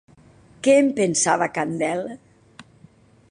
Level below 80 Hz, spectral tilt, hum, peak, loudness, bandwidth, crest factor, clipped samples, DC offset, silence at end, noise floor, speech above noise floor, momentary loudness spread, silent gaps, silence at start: -64 dBFS; -4 dB/octave; none; -6 dBFS; -20 LUFS; 11 kHz; 18 dB; under 0.1%; under 0.1%; 0.7 s; -52 dBFS; 32 dB; 10 LU; none; 0.65 s